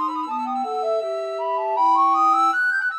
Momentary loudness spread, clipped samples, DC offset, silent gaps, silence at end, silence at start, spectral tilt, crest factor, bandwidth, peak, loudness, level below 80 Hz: 9 LU; under 0.1%; under 0.1%; none; 0 s; 0 s; -1.5 dB/octave; 12 dB; 12.5 kHz; -10 dBFS; -20 LUFS; -88 dBFS